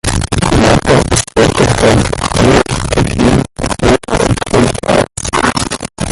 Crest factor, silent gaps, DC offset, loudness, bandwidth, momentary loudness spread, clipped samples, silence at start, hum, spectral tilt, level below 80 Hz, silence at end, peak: 10 dB; none; under 0.1%; -11 LUFS; 12 kHz; 5 LU; under 0.1%; 0.05 s; none; -5 dB/octave; -22 dBFS; 0 s; 0 dBFS